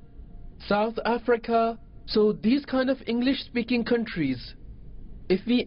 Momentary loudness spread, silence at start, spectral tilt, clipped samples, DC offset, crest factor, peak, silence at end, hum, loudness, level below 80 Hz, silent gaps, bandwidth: 6 LU; 0.05 s; -10.5 dB/octave; under 0.1%; under 0.1%; 14 dB; -12 dBFS; 0 s; none; -26 LUFS; -48 dBFS; none; 5.6 kHz